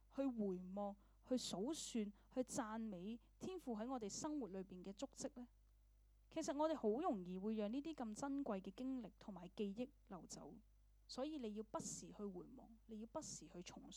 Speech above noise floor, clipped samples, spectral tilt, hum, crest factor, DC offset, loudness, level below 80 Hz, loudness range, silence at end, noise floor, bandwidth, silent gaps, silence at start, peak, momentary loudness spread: 24 dB; under 0.1%; -5 dB/octave; none; 18 dB; under 0.1%; -48 LUFS; -72 dBFS; 6 LU; 0 s; -72 dBFS; 19 kHz; none; 0 s; -30 dBFS; 13 LU